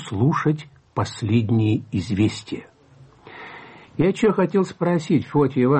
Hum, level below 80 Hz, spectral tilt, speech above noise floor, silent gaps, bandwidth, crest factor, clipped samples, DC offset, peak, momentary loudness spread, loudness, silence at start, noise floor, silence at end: none; -54 dBFS; -7.5 dB/octave; 30 dB; none; 8.6 kHz; 14 dB; under 0.1%; under 0.1%; -8 dBFS; 17 LU; -21 LUFS; 0 s; -50 dBFS; 0 s